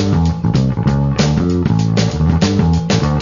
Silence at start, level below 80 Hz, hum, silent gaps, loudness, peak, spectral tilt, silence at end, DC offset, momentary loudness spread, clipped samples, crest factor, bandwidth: 0 s; -26 dBFS; none; none; -15 LUFS; 0 dBFS; -6.5 dB/octave; 0 s; under 0.1%; 2 LU; under 0.1%; 12 dB; 7.4 kHz